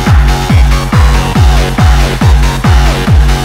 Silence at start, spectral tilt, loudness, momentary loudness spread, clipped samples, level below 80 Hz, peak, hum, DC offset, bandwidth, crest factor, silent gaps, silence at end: 0 s; -5.5 dB/octave; -9 LUFS; 1 LU; 5%; -8 dBFS; 0 dBFS; none; under 0.1%; 15.5 kHz; 6 dB; none; 0 s